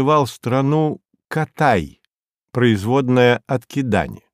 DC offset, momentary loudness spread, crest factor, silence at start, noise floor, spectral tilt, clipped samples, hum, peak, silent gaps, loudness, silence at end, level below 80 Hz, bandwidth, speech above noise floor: under 0.1%; 10 LU; 16 dB; 0 s; -71 dBFS; -7 dB/octave; under 0.1%; none; -2 dBFS; 2.07-2.23 s, 2.30-2.35 s; -18 LUFS; 0.2 s; -48 dBFS; 15.5 kHz; 54 dB